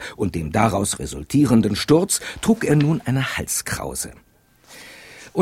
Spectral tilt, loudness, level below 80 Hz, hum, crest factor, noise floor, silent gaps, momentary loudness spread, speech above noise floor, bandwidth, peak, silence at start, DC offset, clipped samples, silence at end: -5 dB/octave; -20 LUFS; -44 dBFS; none; 18 dB; -50 dBFS; none; 13 LU; 30 dB; 16.5 kHz; -2 dBFS; 0 s; under 0.1%; under 0.1%; 0 s